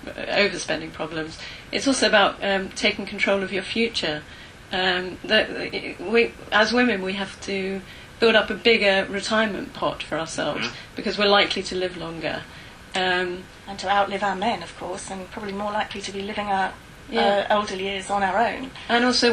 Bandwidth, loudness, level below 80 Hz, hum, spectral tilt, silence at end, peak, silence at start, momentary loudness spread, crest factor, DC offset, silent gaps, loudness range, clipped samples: 12.5 kHz; -23 LUFS; -50 dBFS; none; -3.5 dB/octave; 0 s; -4 dBFS; 0 s; 14 LU; 20 dB; under 0.1%; none; 5 LU; under 0.1%